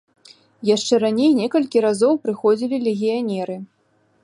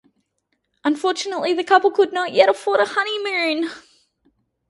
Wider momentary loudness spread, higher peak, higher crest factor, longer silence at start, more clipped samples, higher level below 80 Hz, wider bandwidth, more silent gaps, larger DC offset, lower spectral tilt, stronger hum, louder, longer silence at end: about the same, 9 LU vs 8 LU; second, -4 dBFS vs 0 dBFS; about the same, 16 dB vs 20 dB; second, 0.6 s vs 0.85 s; neither; about the same, -72 dBFS vs -72 dBFS; about the same, 11.5 kHz vs 11.5 kHz; neither; neither; first, -5 dB/octave vs -2.5 dB/octave; neither; about the same, -19 LUFS vs -19 LUFS; second, 0.6 s vs 0.9 s